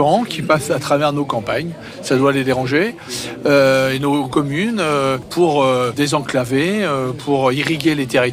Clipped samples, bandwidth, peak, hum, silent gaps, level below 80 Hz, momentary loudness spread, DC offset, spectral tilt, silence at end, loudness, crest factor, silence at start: under 0.1%; 16 kHz; -4 dBFS; none; none; -50 dBFS; 7 LU; under 0.1%; -5 dB/octave; 0 s; -17 LUFS; 12 dB; 0 s